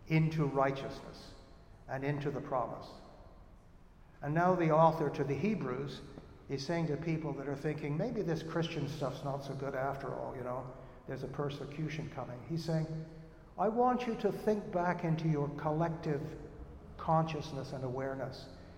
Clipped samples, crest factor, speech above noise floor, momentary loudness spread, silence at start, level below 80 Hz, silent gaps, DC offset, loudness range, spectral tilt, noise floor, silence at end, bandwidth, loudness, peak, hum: under 0.1%; 22 dB; 23 dB; 17 LU; 0 s; -58 dBFS; none; under 0.1%; 7 LU; -7.5 dB/octave; -58 dBFS; 0 s; 9.4 kHz; -35 LUFS; -14 dBFS; none